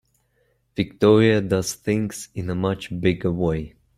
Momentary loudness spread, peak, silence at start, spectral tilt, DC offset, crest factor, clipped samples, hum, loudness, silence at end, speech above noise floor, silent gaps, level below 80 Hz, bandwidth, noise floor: 13 LU; -2 dBFS; 0.75 s; -6 dB/octave; under 0.1%; 20 dB; under 0.1%; none; -22 LUFS; 0.3 s; 45 dB; none; -48 dBFS; 15.5 kHz; -66 dBFS